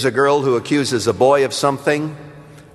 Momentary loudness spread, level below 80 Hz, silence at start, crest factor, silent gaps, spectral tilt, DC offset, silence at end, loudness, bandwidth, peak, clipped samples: 7 LU; -58 dBFS; 0 s; 16 dB; none; -4.5 dB/octave; under 0.1%; 0.15 s; -16 LUFS; 13 kHz; -2 dBFS; under 0.1%